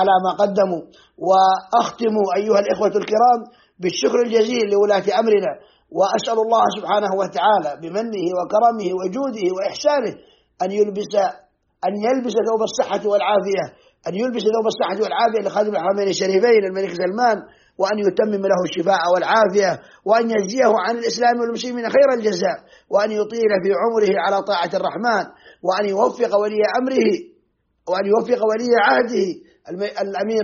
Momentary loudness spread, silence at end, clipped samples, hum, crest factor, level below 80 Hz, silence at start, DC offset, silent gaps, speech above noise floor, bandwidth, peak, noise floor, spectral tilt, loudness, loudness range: 9 LU; 0 s; under 0.1%; none; 16 dB; -66 dBFS; 0 s; under 0.1%; none; 46 dB; 7.2 kHz; -4 dBFS; -65 dBFS; -3 dB/octave; -19 LUFS; 3 LU